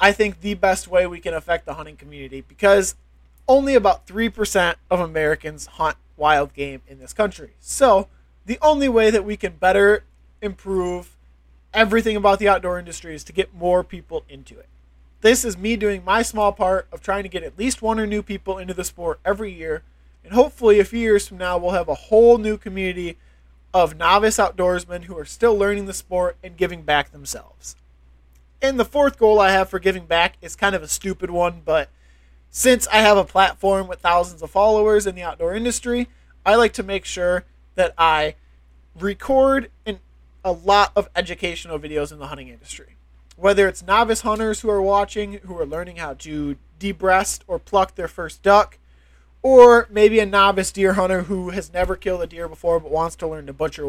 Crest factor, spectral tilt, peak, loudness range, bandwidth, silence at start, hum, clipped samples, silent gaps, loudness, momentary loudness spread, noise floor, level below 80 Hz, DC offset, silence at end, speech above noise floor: 20 dB; -3.5 dB/octave; 0 dBFS; 7 LU; 16 kHz; 0 s; none; under 0.1%; none; -19 LUFS; 15 LU; -52 dBFS; -40 dBFS; under 0.1%; 0 s; 33 dB